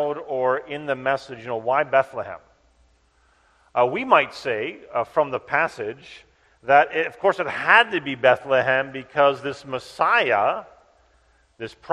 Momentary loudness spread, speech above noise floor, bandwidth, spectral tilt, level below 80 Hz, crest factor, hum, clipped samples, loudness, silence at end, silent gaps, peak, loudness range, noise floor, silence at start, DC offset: 15 LU; 39 dB; 11 kHz; -5 dB/octave; -64 dBFS; 22 dB; none; under 0.1%; -21 LUFS; 0 s; none; 0 dBFS; 6 LU; -61 dBFS; 0 s; under 0.1%